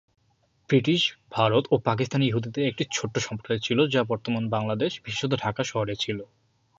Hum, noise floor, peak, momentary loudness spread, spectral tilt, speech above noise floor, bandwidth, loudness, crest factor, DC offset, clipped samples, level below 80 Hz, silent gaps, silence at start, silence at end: none; -67 dBFS; -8 dBFS; 7 LU; -5 dB/octave; 42 dB; 8 kHz; -26 LUFS; 18 dB; under 0.1%; under 0.1%; -60 dBFS; none; 0.7 s; 0.55 s